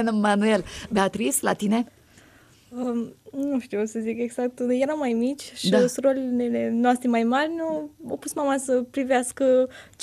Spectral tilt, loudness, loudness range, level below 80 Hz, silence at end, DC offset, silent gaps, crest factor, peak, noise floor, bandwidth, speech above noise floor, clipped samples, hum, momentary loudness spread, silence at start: -4.5 dB/octave; -24 LUFS; 5 LU; -60 dBFS; 0 s; under 0.1%; none; 16 dB; -8 dBFS; -54 dBFS; 14.5 kHz; 30 dB; under 0.1%; none; 10 LU; 0 s